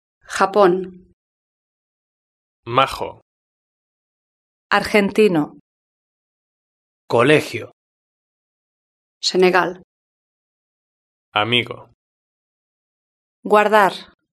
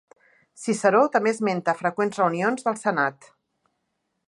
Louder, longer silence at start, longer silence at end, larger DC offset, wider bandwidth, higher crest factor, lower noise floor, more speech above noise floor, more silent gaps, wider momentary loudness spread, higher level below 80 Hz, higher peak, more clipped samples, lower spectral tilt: first, -17 LUFS vs -23 LUFS; second, 0.3 s vs 0.6 s; second, 0.3 s vs 1.15 s; neither; first, 13.5 kHz vs 11.5 kHz; about the same, 20 dB vs 20 dB; first, under -90 dBFS vs -76 dBFS; first, over 73 dB vs 54 dB; first, 1.13-2.63 s, 3.22-4.70 s, 5.60-7.08 s, 7.73-9.21 s, 9.84-11.32 s, 11.94-13.43 s vs none; first, 16 LU vs 7 LU; first, -58 dBFS vs -78 dBFS; first, 0 dBFS vs -6 dBFS; neither; about the same, -4.5 dB/octave vs -5.5 dB/octave